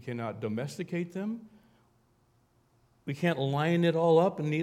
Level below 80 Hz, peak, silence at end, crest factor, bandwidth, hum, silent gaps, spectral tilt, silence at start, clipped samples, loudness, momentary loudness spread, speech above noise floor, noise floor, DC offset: -74 dBFS; -12 dBFS; 0 s; 18 dB; 12.5 kHz; none; none; -7.5 dB/octave; 0 s; under 0.1%; -29 LUFS; 14 LU; 39 dB; -68 dBFS; under 0.1%